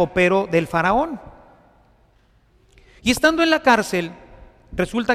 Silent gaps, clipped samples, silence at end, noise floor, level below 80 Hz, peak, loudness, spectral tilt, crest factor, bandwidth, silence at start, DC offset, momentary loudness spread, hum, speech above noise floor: none; under 0.1%; 0 s; -57 dBFS; -44 dBFS; -4 dBFS; -19 LUFS; -4.5 dB/octave; 18 dB; 15.5 kHz; 0 s; under 0.1%; 12 LU; none; 39 dB